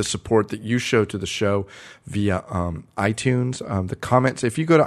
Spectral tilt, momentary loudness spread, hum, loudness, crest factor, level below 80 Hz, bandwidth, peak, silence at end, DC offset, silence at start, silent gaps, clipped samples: -5.5 dB/octave; 7 LU; none; -23 LUFS; 20 dB; -48 dBFS; 13 kHz; -2 dBFS; 0 s; under 0.1%; 0 s; none; under 0.1%